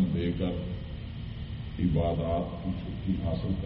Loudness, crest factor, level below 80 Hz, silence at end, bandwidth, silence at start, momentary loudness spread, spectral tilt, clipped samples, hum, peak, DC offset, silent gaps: -32 LUFS; 16 dB; -40 dBFS; 0 s; 5.4 kHz; 0 s; 11 LU; -8 dB/octave; under 0.1%; none; -14 dBFS; under 0.1%; none